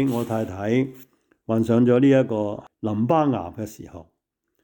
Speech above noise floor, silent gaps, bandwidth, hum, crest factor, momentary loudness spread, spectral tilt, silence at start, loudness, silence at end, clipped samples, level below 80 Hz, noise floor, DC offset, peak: 53 dB; none; 19.5 kHz; none; 16 dB; 18 LU; -8 dB/octave; 0 s; -22 LUFS; 0.6 s; under 0.1%; -62 dBFS; -74 dBFS; under 0.1%; -6 dBFS